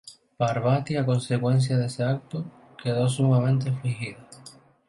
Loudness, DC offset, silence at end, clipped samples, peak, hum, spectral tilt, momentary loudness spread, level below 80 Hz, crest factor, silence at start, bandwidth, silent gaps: -25 LUFS; under 0.1%; 0.35 s; under 0.1%; -10 dBFS; none; -7 dB/octave; 14 LU; -62 dBFS; 14 dB; 0.05 s; 11.5 kHz; none